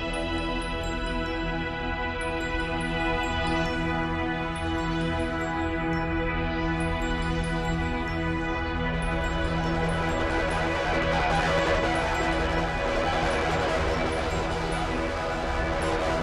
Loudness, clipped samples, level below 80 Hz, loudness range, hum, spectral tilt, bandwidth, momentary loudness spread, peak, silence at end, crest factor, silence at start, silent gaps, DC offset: -27 LUFS; under 0.1%; -34 dBFS; 3 LU; none; -5.5 dB/octave; 12.5 kHz; 5 LU; -12 dBFS; 0 s; 14 dB; 0 s; none; under 0.1%